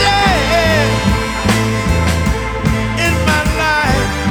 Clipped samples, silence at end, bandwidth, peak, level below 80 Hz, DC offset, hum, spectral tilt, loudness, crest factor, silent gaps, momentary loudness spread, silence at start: under 0.1%; 0 s; over 20 kHz; 0 dBFS; -22 dBFS; under 0.1%; none; -4.5 dB/octave; -14 LUFS; 14 dB; none; 4 LU; 0 s